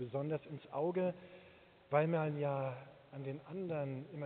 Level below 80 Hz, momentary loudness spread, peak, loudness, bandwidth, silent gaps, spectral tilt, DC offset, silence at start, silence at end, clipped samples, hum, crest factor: -78 dBFS; 17 LU; -18 dBFS; -39 LUFS; 4.4 kHz; none; -7.5 dB/octave; under 0.1%; 0 s; 0 s; under 0.1%; none; 22 dB